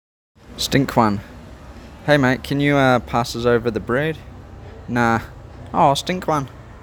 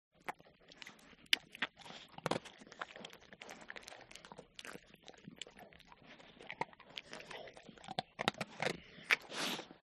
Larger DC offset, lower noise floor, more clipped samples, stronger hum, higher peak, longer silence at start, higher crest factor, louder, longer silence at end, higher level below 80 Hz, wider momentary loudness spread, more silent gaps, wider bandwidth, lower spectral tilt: neither; second, -39 dBFS vs -63 dBFS; neither; neither; first, 0 dBFS vs -8 dBFS; first, 0.5 s vs 0.25 s; second, 20 dB vs 38 dB; first, -19 LUFS vs -42 LUFS; about the same, 0.05 s vs 0.05 s; first, -42 dBFS vs -76 dBFS; about the same, 23 LU vs 22 LU; neither; first, over 20 kHz vs 13 kHz; first, -5.5 dB/octave vs -2.5 dB/octave